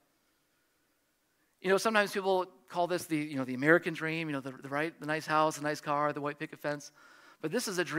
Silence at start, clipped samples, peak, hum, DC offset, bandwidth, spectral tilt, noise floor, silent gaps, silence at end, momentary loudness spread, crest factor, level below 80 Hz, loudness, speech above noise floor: 1.65 s; under 0.1%; -10 dBFS; none; under 0.1%; 16 kHz; -4.5 dB/octave; -75 dBFS; none; 0 s; 11 LU; 22 dB; -80 dBFS; -32 LUFS; 43 dB